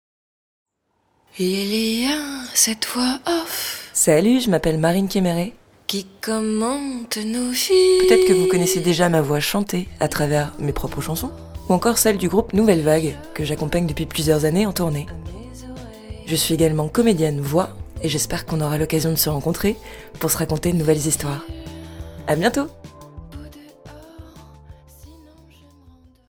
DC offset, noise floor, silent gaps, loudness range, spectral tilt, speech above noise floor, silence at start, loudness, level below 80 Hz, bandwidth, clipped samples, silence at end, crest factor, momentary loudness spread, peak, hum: under 0.1%; -68 dBFS; none; 6 LU; -4.5 dB/octave; 48 dB; 1.35 s; -20 LUFS; -40 dBFS; over 20 kHz; under 0.1%; 1.15 s; 20 dB; 16 LU; 0 dBFS; none